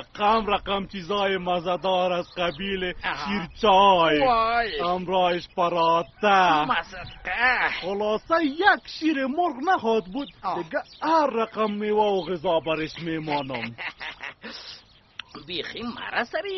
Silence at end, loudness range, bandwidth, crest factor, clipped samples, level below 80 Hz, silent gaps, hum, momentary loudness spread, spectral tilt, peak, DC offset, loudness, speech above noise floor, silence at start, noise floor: 0 s; 8 LU; 6.4 kHz; 18 dB; under 0.1%; -50 dBFS; none; none; 14 LU; -2 dB/octave; -6 dBFS; under 0.1%; -24 LUFS; 21 dB; 0 s; -45 dBFS